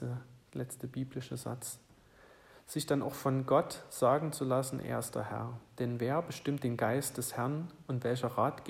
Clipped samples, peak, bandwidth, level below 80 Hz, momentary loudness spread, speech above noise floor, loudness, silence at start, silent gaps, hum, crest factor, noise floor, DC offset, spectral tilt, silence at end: under 0.1%; -16 dBFS; 16 kHz; -68 dBFS; 12 LU; 26 dB; -35 LUFS; 0 s; none; none; 20 dB; -60 dBFS; under 0.1%; -5.5 dB/octave; 0 s